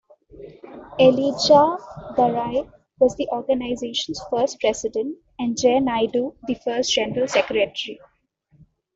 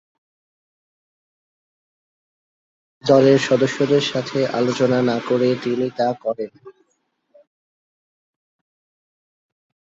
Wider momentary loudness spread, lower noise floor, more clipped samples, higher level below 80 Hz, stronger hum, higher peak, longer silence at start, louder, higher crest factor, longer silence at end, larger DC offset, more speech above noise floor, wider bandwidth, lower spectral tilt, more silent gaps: first, 14 LU vs 11 LU; second, -62 dBFS vs -70 dBFS; neither; first, -54 dBFS vs -66 dBFS; neither; about the same, -4 dBFS vs -2 dBFS; second, 0.35 s vs 3.05 s; about the same, -21 LUFS vs -19 LUFS; about the same, 18 dB vs 20 dB; second, 1 s vs 3.2 s; neither; second, 41 dB vs 52 dB; about the same, 8 kHz vs 8 kHz; second, -4 dB/octave vs -6 dB/octave; neither